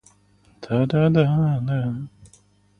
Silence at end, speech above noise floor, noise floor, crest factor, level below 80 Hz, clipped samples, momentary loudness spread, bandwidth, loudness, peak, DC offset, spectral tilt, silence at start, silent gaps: 0.7 s; 38 dB; -57 dBFS; 18 dB; -52 dBFS; under 0.1%; 13 LU; 9.4 kHz; -21 LUFS; -4 dBFS; under 0.1%; -9 dB/octave; 0.6 s; none